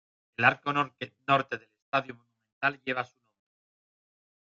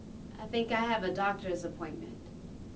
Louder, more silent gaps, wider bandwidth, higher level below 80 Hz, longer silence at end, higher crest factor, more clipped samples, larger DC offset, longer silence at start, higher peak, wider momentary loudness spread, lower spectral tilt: first, -29 LUFS vs -34 LUFS; first, 1.82-1.92 s, 2.52-2.61 s vs none; about the same, 7.6 kHz vs 8 kHz; second, -74 dBFS vs -54 dBFS; first, 1.55 s vs 0 s; first, 26 dB vs 18 dB; neither; neither; first, 0.4 s vs 0 s; first, -6 dBFS vs -18 dBFS; about the same, 15 LU vs 17 LU; about the same, -6 dB/octave vs -5.5 dB/octave